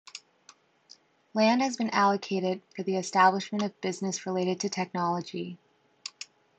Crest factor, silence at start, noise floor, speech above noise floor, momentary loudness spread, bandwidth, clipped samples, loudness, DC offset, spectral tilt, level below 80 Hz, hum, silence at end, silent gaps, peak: 20 dB; 0.15 s; -60 dBFS; 32 dB; 18 LU; 9 kHz; under 0.1%; -28 LUFS; under 0.1%; -4.5 dB/octave; -80 dBFS; none; 0.35 s; none; -8 dBFS